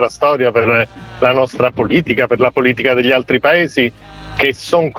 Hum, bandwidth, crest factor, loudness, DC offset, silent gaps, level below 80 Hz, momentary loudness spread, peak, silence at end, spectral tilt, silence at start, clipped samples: none; 17 kHz; 14 dB; -13 LUFS; under 0.1%; none; -44 dBFS; 4 LU; 0 dBFS; 0 s; -5.5 dB/octave; 0 s; under 0.1%